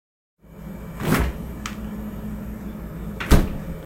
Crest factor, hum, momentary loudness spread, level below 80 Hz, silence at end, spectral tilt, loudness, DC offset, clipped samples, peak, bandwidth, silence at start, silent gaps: 24 dB; none; 16 LU; -28 dBFS; 0 s; -6 dB/octave; -26 LUFS; under 0.1%; under 0.1%; 0 dBFS; 16 kHz; 0.45 s; none